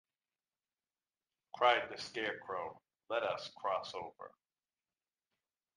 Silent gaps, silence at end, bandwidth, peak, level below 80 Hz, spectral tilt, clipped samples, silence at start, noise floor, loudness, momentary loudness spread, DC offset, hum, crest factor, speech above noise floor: none; 1.45 s; 10.5 kHz; -14 dBFS; -84 dBFS; -3 dB/octave; under 0.1%; 1.55 s; under -90 dBFS; -37 LUFS; 19 LU; under 0.1%; none; 26 dB; over 52 dB